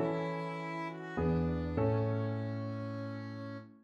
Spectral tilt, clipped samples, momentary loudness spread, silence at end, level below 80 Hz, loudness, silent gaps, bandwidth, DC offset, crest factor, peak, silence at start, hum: -9 dB/octave; under 0.1%; 10 LU; 0.05 s; -52 dBFS; -36 LUFS; none; 7.4 kHz; under 0.1%; 14 dB; -20 dBFS; 0 s; none